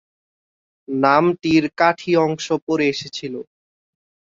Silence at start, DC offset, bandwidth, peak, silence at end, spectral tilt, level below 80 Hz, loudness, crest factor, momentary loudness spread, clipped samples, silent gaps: 0.9 s; under 0.1%; 7.6 kHz; -2 dBFS; 0.9 s; -5.5 dB/octave; -60 dBFS; -19 LUFS; 18 dB; 13 LU; under 0.1%; 2.62-2.67 s